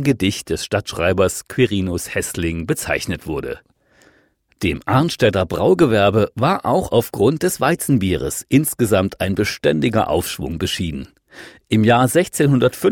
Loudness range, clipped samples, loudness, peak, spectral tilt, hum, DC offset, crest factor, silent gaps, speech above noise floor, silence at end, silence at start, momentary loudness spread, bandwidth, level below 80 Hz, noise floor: 5 LU; under 0.1%; -18 LUFS; -2 dBFS; -5.5 dB/octave; none; under 0.1%; 16 dB; none; 41 dB; 0 s; 0 s; 9 LU; 18 kHz; -42 dBFS; -58 dBFS